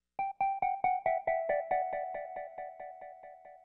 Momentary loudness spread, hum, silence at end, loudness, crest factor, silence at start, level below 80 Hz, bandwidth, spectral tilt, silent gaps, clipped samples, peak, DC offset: 17 LU; none; 0.05 s; -34 LUFS; 16 dB; 0.2 s; -66 dBFS; 3.9 kHz; -7.5 dB/octave; none; under 0.1%; -18 dBFS; under 0.1%